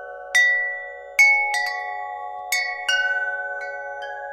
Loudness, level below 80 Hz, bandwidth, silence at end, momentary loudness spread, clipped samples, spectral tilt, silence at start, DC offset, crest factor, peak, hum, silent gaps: -20 LUFS; -66 dBFS; 16 kHz; 0 s; 17 LU; under 0.1%; 3.5 dB/octave; 0 s; under 0.1%; 18 dB; -6 dBFS; none; none